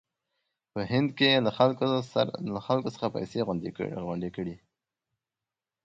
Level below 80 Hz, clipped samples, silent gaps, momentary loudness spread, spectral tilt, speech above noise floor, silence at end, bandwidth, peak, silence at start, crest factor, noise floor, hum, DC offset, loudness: -62 dBFS; under 0.1%; none; 12 LU; -6.5 dB/octave; over 62 dB; 1.25 s; 7.8 kHz; -8 dBFS; 0.75 s; 22 dB; under -90 dBFS; none; under 0.1%; -28 LUFS